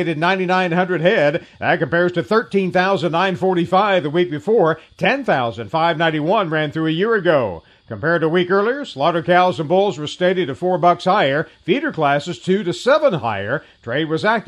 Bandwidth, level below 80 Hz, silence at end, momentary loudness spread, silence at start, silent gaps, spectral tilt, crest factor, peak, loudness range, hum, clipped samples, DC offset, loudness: 10.5 kHz; -58 dBFS; 0.05 s; 6 LU; 0 s; none; -6.5 dB/octave; 16 dB; -2 dBFS; 1 LU; none; under 0.1%; under 0.1%; -18 LUFS